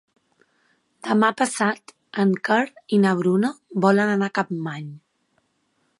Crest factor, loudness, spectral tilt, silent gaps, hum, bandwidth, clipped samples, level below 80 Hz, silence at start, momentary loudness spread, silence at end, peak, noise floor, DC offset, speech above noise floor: 20 dB; -21 LUFS; -6 dB/octave; none; none; 11.5 kHz; under 0.1%; -74 dBFS; 1.05 s; 14 LU; 1 s; -4 dBFS; -69 dBFS; under 0.1%; 48 dB